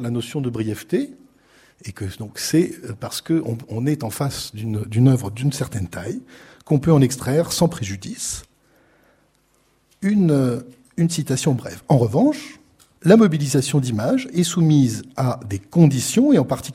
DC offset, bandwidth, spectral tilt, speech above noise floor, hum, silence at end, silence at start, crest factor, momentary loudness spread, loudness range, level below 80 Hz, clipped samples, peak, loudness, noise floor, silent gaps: under 0.1%; 16 kHz; -6 dB/octave; 42 dB; none; 0 s; 0 s; 20 dB; 14 LU; 6 LU; -52 dBFS; under 0.1%; 0 dBFS; -20 LUFS; -61 dBFS; none